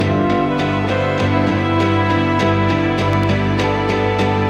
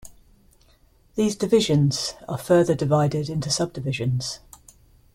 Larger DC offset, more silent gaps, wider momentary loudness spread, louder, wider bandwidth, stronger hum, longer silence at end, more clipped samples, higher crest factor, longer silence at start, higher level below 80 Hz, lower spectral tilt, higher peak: neither; neither; second, 2 LU vs 11 LU; first, -16 LUFS vs -23 LUFS; second, 8.4 kHz vs 15.5 kHz; first, 50 Hz at -35 dBFS vs none; second, 0 s vs 0.8 s; neither; second, 12 dB vs 18 dB; about the same, 0 s vs 0.05 s; first, -38 dBFS vs -54 dBFS; first, -7 dB/octave vs -5.5 dB/octave; about the same, -4 dBFS vs -6 dBFS